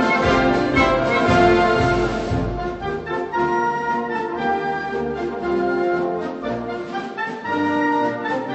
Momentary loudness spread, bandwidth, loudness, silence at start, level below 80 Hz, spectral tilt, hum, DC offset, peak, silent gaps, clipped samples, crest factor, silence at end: 10 LU; 8.4 kHz; -20 LUFS; 0 s; -38 dBFS; -6.5 dB/octave; none; under 0.1%; -4 dBFS; none; under 0.1%; 16 dB; 0 s